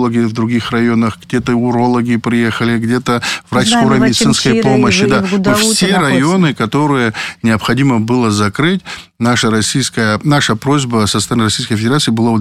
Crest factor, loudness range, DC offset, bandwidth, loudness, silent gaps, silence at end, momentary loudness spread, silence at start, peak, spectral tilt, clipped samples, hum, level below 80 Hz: 10 dB; 3 LU; 0.3%; 14.5 kHz; -12 LUFS; none; 0 s; 5 LU; 0 s; -2 dBFS; -4.5 dB/octave; under 0.1%; none; -44 dBFS